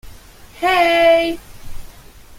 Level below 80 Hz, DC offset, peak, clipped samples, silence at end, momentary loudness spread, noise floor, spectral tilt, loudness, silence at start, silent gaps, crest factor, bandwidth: -40 dBFS; under 0.1%; -2 dBFS; under 0.1%; 0.05 s; 11 LU; -40 dBFS; -3.5 dB/octave; -15 LUFS; 0.05 s; none; 16 dB; 16.5 kHz